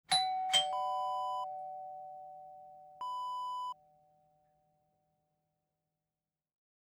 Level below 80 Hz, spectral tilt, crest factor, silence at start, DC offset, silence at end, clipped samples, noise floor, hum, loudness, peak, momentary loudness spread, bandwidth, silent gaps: -88 dBFS; 0.5 dB/octave; 24 dB; 0.1 s; under 0.1%; 3.2 s; under 0.1%; under -90 dBFS; none; -35 LUFS; -16 dBFS; 22 LU; over 20 kHz; none